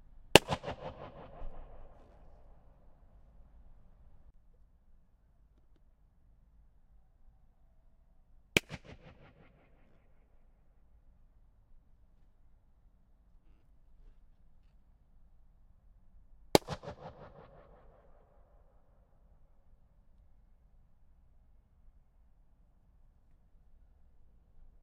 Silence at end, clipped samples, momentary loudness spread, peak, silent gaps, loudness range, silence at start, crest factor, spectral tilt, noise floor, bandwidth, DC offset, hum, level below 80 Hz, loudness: 7.4 s; under 0.1%; 33 LU; 0 dBFS; none; 21 LU; 0.3 s; 42 dB; -3.5 dB/octave; -65 dBFS; 8.8 kHz; under 0.1%; none; -58 dBFS; -30 LUFS